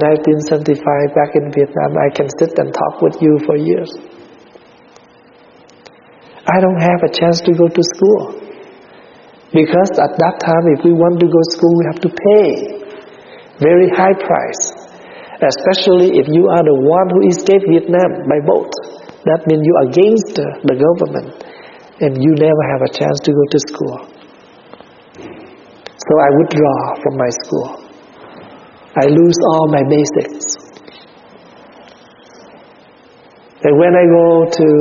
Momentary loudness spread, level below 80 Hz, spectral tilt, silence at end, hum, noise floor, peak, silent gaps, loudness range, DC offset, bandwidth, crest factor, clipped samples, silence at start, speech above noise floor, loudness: 13 LU; -56 dBFS; -6 dB/octave; 0 s; none; -44 dBFS; 0 dBFS; none; 6 LU; under 0.1%; 7.2 kHz; 14 dB; under 0.1%; 0 s; 33 dB; -12 LUFS